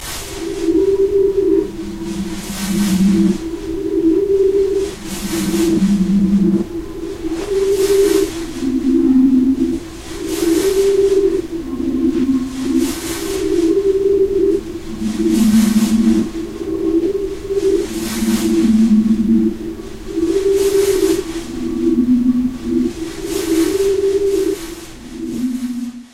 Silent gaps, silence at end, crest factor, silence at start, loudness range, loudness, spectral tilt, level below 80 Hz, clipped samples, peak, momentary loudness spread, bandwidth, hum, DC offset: none; 0.05 s; 12 dB; 0 s; 2 LU; -16 LUFS; -6 dB/octave; -36 dBFS; under 0.1%; -2 dBFS; 12 LU; 16 kHz; none; under 0.1%